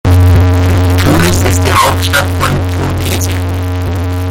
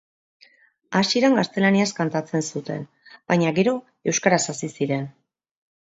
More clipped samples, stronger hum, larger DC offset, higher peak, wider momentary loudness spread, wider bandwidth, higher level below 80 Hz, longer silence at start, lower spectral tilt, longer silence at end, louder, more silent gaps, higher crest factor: neither; neither; neither; about the same, 0 dBFS vs -2 dBFS; second, 8 LU vs 11 LU; first, 17 kHz vs 8.2 kHz; first, -24 dBFS vs -68 dBFS; second, 0.05 s vs 0.9 s; about the same, -5 dB/octave vs -4.5 dB/octave; second, 0 s vs 0.85 s; first, -10 LUFS vs -22 LUFS; neither; second, 10 dB vs 20 dB